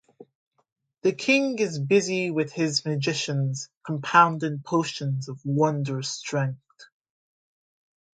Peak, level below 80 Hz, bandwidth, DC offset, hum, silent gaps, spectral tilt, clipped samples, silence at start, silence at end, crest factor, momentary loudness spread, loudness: -4 dBFS; -72 dBFS; 9.4 kHz; under 0.1%; none; 0.35-0.51 s, 0.72-0.76 s, 3.77-3.81 s; -5 dB/octave; under 0.1%; 0.2 s; 1.3 s; 22 dB; 10 LU; -25 LUFS